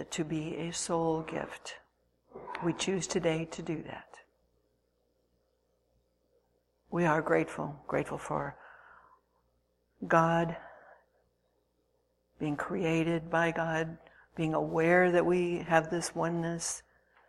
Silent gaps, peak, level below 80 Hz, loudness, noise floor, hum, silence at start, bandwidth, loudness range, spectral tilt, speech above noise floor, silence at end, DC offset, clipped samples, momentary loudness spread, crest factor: none; -10 dBFS; -64 dBFS; -31 LUFS; -75 dBFS; 60 Hz at -65 dBFS; 0 s; 12.5 kHz; 8 LU; -5 dB/octave; 44 dB; 0.5 s; under 0.1%; under 0.1%; 16 LU; 24 dB